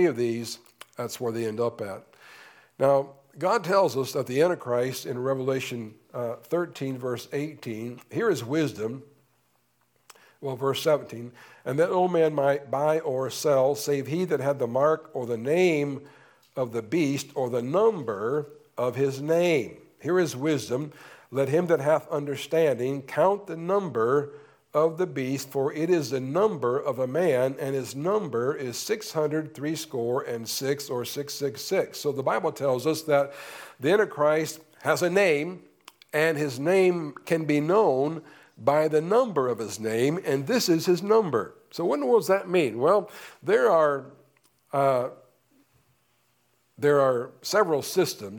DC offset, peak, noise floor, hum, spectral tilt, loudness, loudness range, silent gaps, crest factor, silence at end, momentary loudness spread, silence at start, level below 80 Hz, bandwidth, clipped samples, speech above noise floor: under 0.1%; -8 dBFS; -69 dBFS; none; -5.5 dB/octave; -26 LUFS; 6 LU; none; 18 dB; 0 s; 11 LU; 0 s; -76 dBFS; 19 kHz; under 0.1%; 44 dB